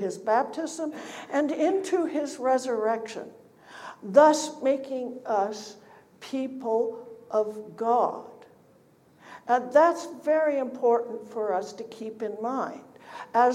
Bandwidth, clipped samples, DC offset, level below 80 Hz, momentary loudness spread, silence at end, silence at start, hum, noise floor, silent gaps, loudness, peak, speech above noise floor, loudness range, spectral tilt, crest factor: 14 kHz; under 0.1%; under 0.1%; -82 dBFS; 19 LU; 0 s; 0 s; none; -59 dBFS; none; -26 LUFS; -4 dBFS; 33 dB; 5 LU; -4 dB/octave; 22 dB